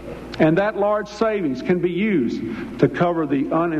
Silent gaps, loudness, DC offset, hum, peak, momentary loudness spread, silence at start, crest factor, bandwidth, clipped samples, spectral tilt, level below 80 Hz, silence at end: none; -21 LUFS; under 0.1%; none; -4 dBFS; 6 LU; 0 s; 16 dB; 8.4 kHz; under 0.1%; -8 dB/octave; -48 dBFS; 0 s